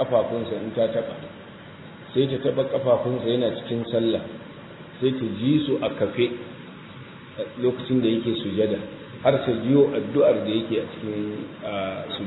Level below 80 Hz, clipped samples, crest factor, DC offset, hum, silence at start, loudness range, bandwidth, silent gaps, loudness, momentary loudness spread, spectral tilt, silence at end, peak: -60 dBFS; under 0.1%; 18 dB; under 0.1%; none; 0 s; 4 LU; 4.1 kHz; none; -24 LUFS; 20 LU; -10 dB/octave; 0 s; -6 dBFS